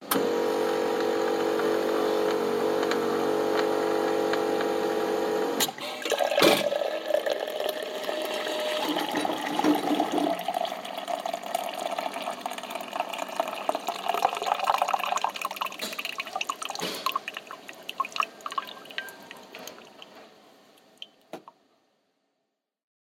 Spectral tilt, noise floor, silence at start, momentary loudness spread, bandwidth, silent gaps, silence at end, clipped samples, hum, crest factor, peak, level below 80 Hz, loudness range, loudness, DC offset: -3 dB/octave; -81 dBFS; 0 s; 14 LU; 17 kHz; none; 1.6 s; under 0.1%; none; 20 dB; -8 dBFS; -74 dBFS; 10 LU; -28 LUFS; under 0.1%